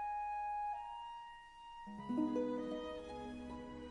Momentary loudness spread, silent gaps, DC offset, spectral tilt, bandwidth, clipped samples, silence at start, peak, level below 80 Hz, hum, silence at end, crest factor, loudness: 14 LU; none; under 0.1%; -6.5 dB/octave; 10.5 kHz; under 0.1%; 0 s; -26 dBFS; -64 dBFS; none; 0 s; 16 dB; -43 LUFS